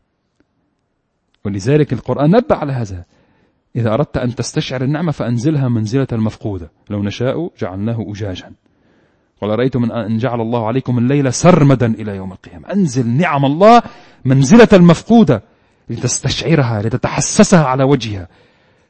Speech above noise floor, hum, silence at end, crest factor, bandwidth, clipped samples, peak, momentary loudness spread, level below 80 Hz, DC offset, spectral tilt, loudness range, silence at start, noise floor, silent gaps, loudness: 53 dB; none; 0.65 s; 14 dB; 8.8 kHz; under 0.1%; 0 dBFS; 16 LU; -42 dBFS; under 0.1%; -6 dB/octave; 10 LU; 1.45 s; -67 dBFS; none; -14 LUFS